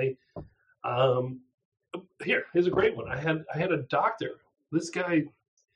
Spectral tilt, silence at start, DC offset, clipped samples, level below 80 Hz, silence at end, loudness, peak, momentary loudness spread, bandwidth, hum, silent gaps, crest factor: -6 dB/octave; 0 s; under 0.1%; under 0.1%; -62 dBFS; 0.45 s; -29 LUFS; -12 dBFS; 18 LU; 10 kHz; none; 1.54-1.58 s, 1.65-1.72 s; 18 dB